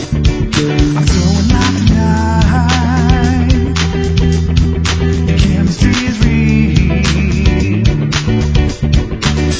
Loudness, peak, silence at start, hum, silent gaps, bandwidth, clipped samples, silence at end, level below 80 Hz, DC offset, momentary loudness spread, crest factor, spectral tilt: -12 LUFS; 0 dBFS; 0 s; none; none; 8 kHz; under 0.1%; 0 s; -16 dBFS; under 0.1%; 3 LU; 10 dB; -6 dB/octave